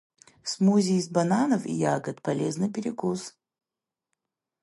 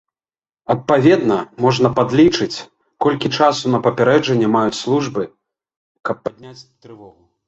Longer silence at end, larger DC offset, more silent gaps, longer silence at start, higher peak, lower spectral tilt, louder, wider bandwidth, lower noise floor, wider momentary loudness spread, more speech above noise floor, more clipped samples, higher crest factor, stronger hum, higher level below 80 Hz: first, 1.35 s vs 0.4 s; neither; second, none vs 5.76-5.95 s; second, 0.45 s vs 0.7 s; second, -10 dBFS vs -2 dBFS; about the same, -6 dB/octave vs -6 dB/octave; second, -26 LUFS vs -16 LUFS; first, 11.5 kHz vs 8.2 kHz; about the same, -90 dBFS vs under -90 dBFS; about the same, 11 LU vs 13 LU; second, 64 dB vs over 74 dB; neither; about the same, 16 dB vs 16 dB; neither; second, -72 dBFS vs -54 dBFS